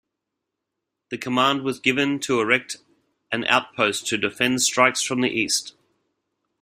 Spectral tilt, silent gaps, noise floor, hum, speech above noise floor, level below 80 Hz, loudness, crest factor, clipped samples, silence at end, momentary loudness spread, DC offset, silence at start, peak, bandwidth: -2.5 dB/octave; none; -82 dBFS; none; 60 dB; -64 dBFS; -21 LUFS; 22 dB; under 0.1%; 0.9 s; 12 LU; under 0.1%; 1.1 s; -2 dBFS; 16 kHz